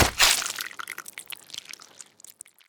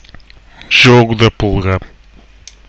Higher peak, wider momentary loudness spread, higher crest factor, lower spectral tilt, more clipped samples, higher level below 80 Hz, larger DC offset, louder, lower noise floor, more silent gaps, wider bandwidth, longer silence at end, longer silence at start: about the same, 0 dBFS vs 0 dBFS; first, 26 LU vs 11 LU; first, 28 dB vs 12 dB; second, -1 dB/octave vs -5.5 dB/octave; neither; second, -46 dBFS vs -30 dBFS; neither; second, -23 LUFS vs -10 LUFS; first, -50 dBFS vs -41 dBFS; neither; first, over 20 kHz vs 8.4 kHz; second, 0.35 s vs 0.8 s; second, 0 s vs 0.7 s